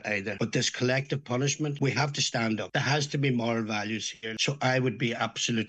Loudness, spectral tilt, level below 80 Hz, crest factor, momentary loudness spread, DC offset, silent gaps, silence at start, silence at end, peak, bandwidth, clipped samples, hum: -28 LUFS; -4 dB/octave; -68 dBFS; 18 dB; 4 LU; under 0.1%; none; 0.05 s; 0 s; -10 dBFS; 8.8 kHz; under 0.1%; none